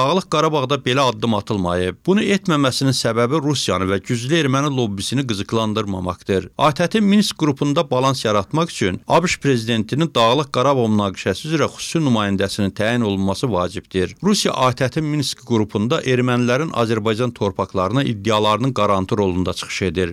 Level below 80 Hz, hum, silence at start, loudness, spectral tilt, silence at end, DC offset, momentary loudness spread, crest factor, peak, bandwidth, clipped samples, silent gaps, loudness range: -54 dBFS; none; 0 s; -19 LUFS; -5.5 dB/octave; 0 s; under 0.1%; 5 LU; 12 dB; -6 dBFS; 15 kHz; under 0.1%; none; 2 LU